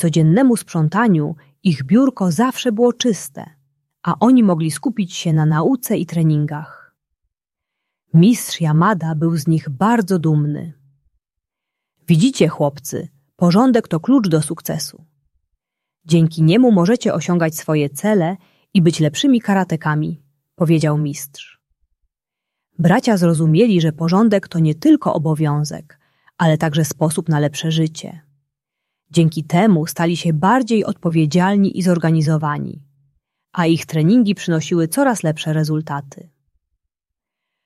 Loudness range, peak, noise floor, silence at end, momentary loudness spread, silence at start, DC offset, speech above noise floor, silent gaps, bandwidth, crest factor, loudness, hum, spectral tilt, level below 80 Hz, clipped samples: 4 LU; -2 dBFS; -84 dBFS; 1.55 s; 11 LU; 0 s; under 0.1%; 68 dB; none; 14 kHz; 16 dB; -16 LUFS; none; -6.5 dB/octave; -58 dBFS; under 0.1%